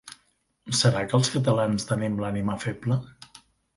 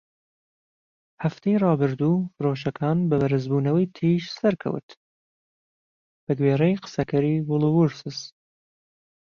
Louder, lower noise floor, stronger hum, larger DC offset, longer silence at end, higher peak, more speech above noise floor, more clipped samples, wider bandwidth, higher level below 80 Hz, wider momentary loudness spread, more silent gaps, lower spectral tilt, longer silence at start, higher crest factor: about the same, -25 LUFS vs -23 LUFS; second, -68 dBFS vs under -90 dBFS; neither; neither; second, 0.65 s vs 1.1 s; about the same, -8 dBFS vs -8 dBFS; second, 44 dB vs over 67 dB; neither; first, 11.5 kHz vs 7 kHz; about the same, -56 dBFS vs -60 dBFS; about the same, 8 LU vs 10 LU; second, none vs 4.83-4.88 s, 4.97-6.27 s; second, -5 dB/octave vs -8 dB/octave; second, 0.05 s vs 1.2 s; about the same, 18 dB vs 16 dB